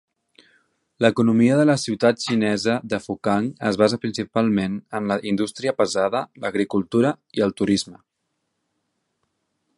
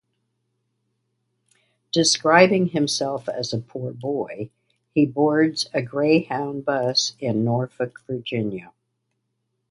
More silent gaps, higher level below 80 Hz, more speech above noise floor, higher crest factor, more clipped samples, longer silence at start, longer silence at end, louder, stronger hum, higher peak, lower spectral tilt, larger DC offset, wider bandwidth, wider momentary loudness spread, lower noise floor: neither; first, -58 dBFS vs -66 dBFS; about the same, 55 dB vs 54 dB; about the same, 20 dB vs 22 dB; neither; second, 1 s vs 1.95 s; first, 1.85 s vs 1.05 s; about the same, -21 LUFS vs -22 LUFS; neither; about the same, -2 dBFS vs 0 dBFS; about the same, -5.5 dB/octave vs -4.5 dB/octave; neither; about the same, 11.5 kHz vs 11.5 kHz; second, 8 LU vs 14 LU; about the same, -76 dBFS vs -75 dBFS